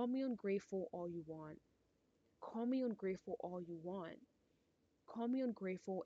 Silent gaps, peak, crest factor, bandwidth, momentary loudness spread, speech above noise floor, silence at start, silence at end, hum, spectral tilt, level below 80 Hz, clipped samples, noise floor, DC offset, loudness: none; -30 dBFS; 14 dB; 7.8 kHz; 14 LU; 36 dB; 0 s; 0 s; none; -7 dB/octave; -84 dBFS; under 0.1%; -80 dBFS; under 0.1%; -45 LUFS